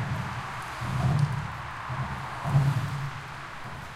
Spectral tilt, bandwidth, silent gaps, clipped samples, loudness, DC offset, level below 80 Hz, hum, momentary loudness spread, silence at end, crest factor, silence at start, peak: -6.5 dB/octave; 13.5 kHz; none; under 0.1%; -30 LUFS; under 0.1%; -48 dBFS; none; 13 LU; 0 s; 18 dB; 0 s; -12 dBFS